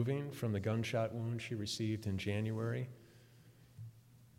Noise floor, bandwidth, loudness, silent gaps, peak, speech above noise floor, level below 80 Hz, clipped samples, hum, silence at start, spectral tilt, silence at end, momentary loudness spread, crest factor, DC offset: -62 dBFS; 16 kHz; -39 LUFS; none; -24 dBFS; 24 dB; -70 dBFS; under 0.1%; none; 0 s; -6 dB/octave; 0.15 s; 18 LU; 16 dB; under 0.1%